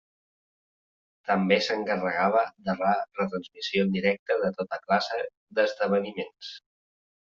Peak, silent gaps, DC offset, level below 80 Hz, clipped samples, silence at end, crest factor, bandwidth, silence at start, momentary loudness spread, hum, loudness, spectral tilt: -8 dBFS; 4.19-4.26 s, 5.37-5.47 s; under 0.1%; -70 dBFS; under 0.1%; 0.65 s; 20 dB; 7.4 kHz; 1.25 s; 12 LU; none; -27 LUFS; -3.5 dB/octave